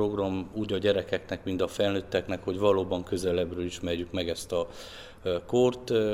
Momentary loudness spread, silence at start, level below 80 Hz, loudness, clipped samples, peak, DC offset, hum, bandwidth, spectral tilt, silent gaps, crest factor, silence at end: 8 LU; 0 s; -54 dBFS; -29 LUFS; under 0.1%; -10 dBFS; under 0.1%; none; 16 kHz; -5.5 dB/octave; none; 18 dB; 0 s